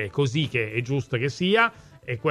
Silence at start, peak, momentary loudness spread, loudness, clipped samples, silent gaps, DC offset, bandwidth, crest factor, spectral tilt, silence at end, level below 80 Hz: 0 s; -6 dBFS; 8 LU; -24 LUFS; under 0.1%; none; under 0.1%; 11.5 kHz; 20 dB; -6 dB/octave; 0 s; -58 dBFS